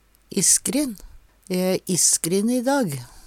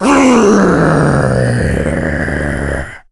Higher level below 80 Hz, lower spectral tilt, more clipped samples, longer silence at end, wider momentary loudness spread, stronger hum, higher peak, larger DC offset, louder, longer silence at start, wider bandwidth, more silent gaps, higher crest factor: second, -52 dBFS vs -26 dBFS; second, -3 dB/octave vs -6.5 dB/octave; neither; second, 0 s vs 0.15 s; first, 12 LU vs 9 LU; neither; second, -4 dBFS vs 0 dBFS; neither; second, -20 LUFS vs -12 LUFS; first, 0.3 s vs 0 s; first, 17 kHz vs 12 kHz; neither; first, 20 dB vs 12 dB